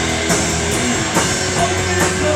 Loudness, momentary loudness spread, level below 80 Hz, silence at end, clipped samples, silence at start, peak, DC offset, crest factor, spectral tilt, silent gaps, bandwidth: -16 LUFS; 1 LU; -34 dBFS; 0 s; under 0.1%; 0 s; -2 dBFS; under 0.1%; 14 dB; -3 dB/octave; none; 16.5 kHz